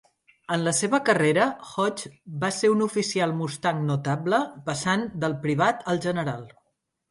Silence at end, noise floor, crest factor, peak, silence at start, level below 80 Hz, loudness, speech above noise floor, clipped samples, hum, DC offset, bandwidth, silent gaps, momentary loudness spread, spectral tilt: 0.65 s; -75 dBFS; 20 dB; -4 dBFS; 0.5 s; -64 dBFS; -25 LUFS; 51 dB; under 0.1%; none; under 0.1%; 11.5 kHz; none; 8 LU; -5 dB/octave